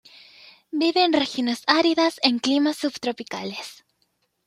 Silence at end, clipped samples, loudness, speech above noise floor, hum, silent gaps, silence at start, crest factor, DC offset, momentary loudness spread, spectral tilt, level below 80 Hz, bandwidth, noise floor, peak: 0.75 s; under 0.1%; -22 LUFS; 48 dB; none; none; 0.75 s; 22 dB; under 0.1%; 13 LU; -3 dB/octave; -70 dBFS; 14.5 kHz; -71 dBFS; -2 dBFS